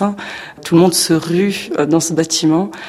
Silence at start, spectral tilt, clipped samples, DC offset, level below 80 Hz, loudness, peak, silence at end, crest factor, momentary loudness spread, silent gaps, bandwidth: 0 s; -4.5 dB/octave; under 0.1%; under 0.1%; -54 dBFS; -14 LUFS; 0 dBFS; 0 s; 14 dB; 12 LU; none; 16 kHz